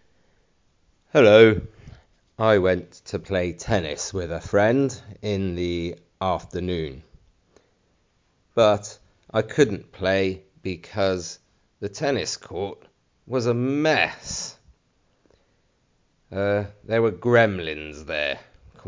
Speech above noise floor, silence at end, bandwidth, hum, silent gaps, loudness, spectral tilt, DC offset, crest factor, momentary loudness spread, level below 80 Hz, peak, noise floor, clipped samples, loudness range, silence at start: 44 dB; 0.45 s; 7.6 kHz; none; none; -23 LUFS; -5 dB/octave; under 0.1%; 22 dB; 15 LU; -46 dBFS; -2 dBFS; -66 dBFS; under 0.1%; 8 LU; 1.15 s